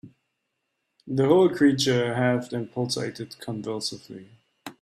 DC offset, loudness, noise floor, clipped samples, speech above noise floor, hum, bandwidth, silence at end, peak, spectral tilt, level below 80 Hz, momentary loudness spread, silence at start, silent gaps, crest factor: under 0.1%; -24 LUFS; -79 dBFS; under 0.1%; 55 dB; none; 14 kHz; 0.1 s; -6 dBFS; -5.5 dB/octave; -66 dBFS; 23 LU; 0.05 s; none; 18 dB